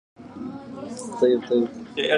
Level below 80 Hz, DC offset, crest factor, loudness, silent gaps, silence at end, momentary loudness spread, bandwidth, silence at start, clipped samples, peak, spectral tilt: -64 dBFS; under 0.1%; 18 dB; -24 LUFS; none; 0 s; 16 LU; 11 kHz; 0.2 s; under 0.1%; -6 dBFS; -4.5 dB/octave